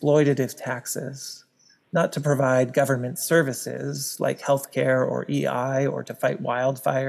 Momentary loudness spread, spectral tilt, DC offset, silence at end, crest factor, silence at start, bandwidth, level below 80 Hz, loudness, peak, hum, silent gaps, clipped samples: 10 LU; -5.5 dB/octave; under 0.1%; 0 s; 18 dB; 0 s; 15 kHz; -82 dBFS; -24 LUFS; -6 dBFS; none; none; under 0.1%